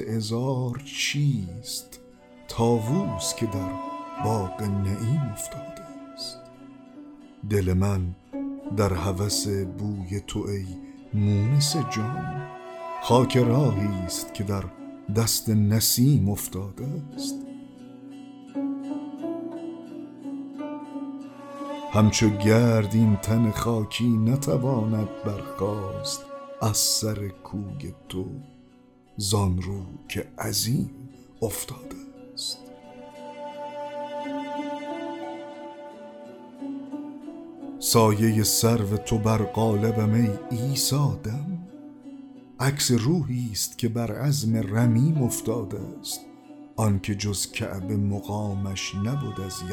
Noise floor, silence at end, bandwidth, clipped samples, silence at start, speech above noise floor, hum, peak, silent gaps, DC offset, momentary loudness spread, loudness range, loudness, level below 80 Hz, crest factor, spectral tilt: -54 dBFS; 0 s; 18 kHz; under 0.1%; 0 s; 30 dB; none; -6 dBFS; none; under 0.1%; 19 LU; 12 LU; -26 LUFS; -52 dBFS; 20 dB; -5 dB/octave